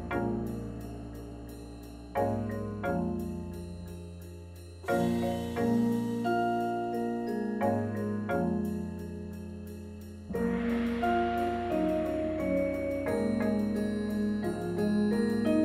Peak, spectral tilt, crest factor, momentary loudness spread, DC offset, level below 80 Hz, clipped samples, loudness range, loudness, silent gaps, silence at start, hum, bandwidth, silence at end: -16 dBFS; -7.5 dB/octave; 16 dB; 15 LU; under 0.1%; -50 dBFS; under 0.1%; 6 LU; -31 LUFS; none; 0 s; none; 16 kHz; 0 s